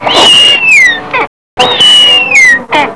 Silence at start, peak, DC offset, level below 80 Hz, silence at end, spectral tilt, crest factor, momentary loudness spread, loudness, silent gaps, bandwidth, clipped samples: 0 s; 0 dBFS; 1%; -44 dBFS; 0 s; -0.5 dB/octave; 6 dB; 11 LU; -3 LUFS; 1.27-1.57 s; 11 kHz; 6%